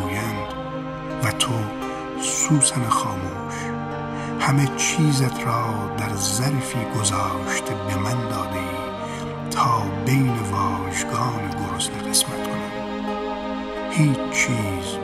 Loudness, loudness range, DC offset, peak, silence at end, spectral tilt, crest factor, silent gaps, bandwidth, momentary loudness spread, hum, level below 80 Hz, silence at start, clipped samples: -23 LUFS; 2 LU; under 0.1%; -4 dBFS; 0 s; -4 dB/octave; 18 dB; none; 15.5 kHz; 9 LU; none; -48 dBFS; 0 s; under 0.1%